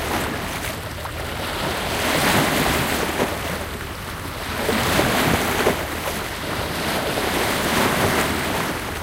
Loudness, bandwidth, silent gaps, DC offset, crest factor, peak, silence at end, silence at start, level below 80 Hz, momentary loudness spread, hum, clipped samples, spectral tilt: -22 LUFS; 17 kHz; none; under 0.1%; 18 dB; -4 dBFS; 0 s; 0 s; -36 dBFS; 10 LU; none; under 0.1%; -3.5 dB/octave